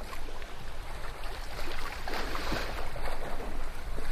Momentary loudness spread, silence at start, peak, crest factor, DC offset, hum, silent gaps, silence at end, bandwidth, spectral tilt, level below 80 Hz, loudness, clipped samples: 9 LU; 0 s; -18 dBFS; 12 dB; under 0.1%; none; none; 0 s; 14 kHz; -4 dB/octave; -34 dBFS; -39 LUFS; under 0.1%